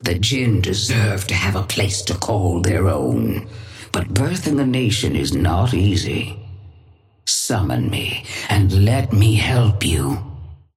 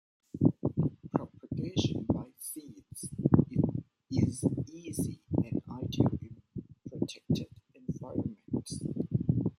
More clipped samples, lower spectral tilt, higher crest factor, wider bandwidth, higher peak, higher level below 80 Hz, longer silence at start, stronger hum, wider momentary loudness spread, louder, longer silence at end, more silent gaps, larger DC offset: neither; second, -5 dB/octave vs -7 dB/octave; second, 14 dB vs 24 dB; about the same, 15.5 kHz vs 15 kHz; first, -4 dBFS vs -8 dBFS; first, -36 dBFS vs -56 dBFS; second, 0 s vs 0.35 s; neither; second, 10 LU vs 16 LU; first, -19 LUFS vs -33 LUFS; first, 0.2 s vs 0.05 s; neither; neither